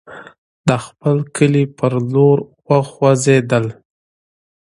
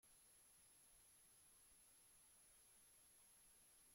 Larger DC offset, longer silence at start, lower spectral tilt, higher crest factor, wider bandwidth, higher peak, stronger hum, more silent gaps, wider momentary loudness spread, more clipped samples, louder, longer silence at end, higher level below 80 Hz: neither; about the same, 0.1 s vs 0 s; first, -6.5 dB/octave vs -0.5 dB/octave; about the same, 16 dB vs 12 dB; second, 11.5 kHz vs 16.5 kHz; first, 0 dBFS vs -60 dBFS; neither; first, 0.38-0.64 s vs none; first, 6 LU vs 0 LU; neither; first, -16 LUFS vs -69 LUFS; first, 1 s vs 0 s; first, -54 dBFS vs -88 dBFS